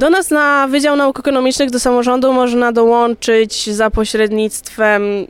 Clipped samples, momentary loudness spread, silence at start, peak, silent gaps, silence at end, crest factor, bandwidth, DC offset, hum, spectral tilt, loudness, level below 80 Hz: under 0.1%; 4 LU; 0 s; -2 dBFS; none; 0.05 s; 12 dB; 16.5 kHz; under 0.1%; none; -3.5 dB/octave; -13 LUFS; -34 dBFS